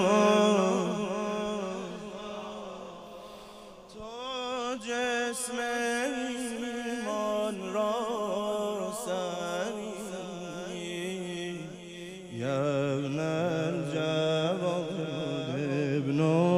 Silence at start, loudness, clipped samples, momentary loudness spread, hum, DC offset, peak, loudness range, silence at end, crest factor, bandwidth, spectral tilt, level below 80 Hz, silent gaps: 0 s; -31 LUFS; under 0.1%; 15 LU; none; under 0.1%; -10 dBFS; 7 LU; 0 s; 20 dB; 15.5 kHz; -5 dB/octave; -66 dBFS; none